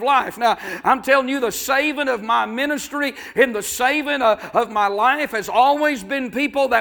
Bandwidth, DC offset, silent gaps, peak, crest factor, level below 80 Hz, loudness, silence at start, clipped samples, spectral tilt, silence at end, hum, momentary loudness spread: 19.5 kHz; under 0.1%; none; 0 dBFS; 18 dB; -56 dBFS; -19 LUFS; 0 s; under 0.1%; -2.5 dB/octave; 0 s; none; 6 LU